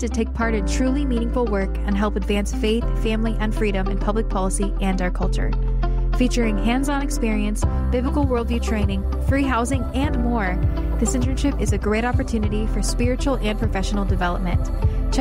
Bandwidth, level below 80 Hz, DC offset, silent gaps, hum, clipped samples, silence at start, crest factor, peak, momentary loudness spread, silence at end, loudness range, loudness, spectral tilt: 12.5 kHz; -24 dBFS; under 0.1%; none; none; under 0.1%; 0 s; 12 dB; -8 dBFS; 3 LU; 0 s; 1 LU; -22 LUFS; -6 dB/octave